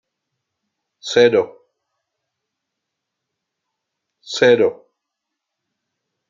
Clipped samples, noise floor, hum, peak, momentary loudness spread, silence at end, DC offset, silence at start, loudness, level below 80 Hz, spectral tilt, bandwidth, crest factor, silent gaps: under 0.1%; -80 dBFS; none; -2 dBFS; 15 LU; 1.6 s; under 0.1%; 1.05 s; -15 LUFS; -68 dBFS; -4 dB/octave; 7.6 kHz; 20 dB; none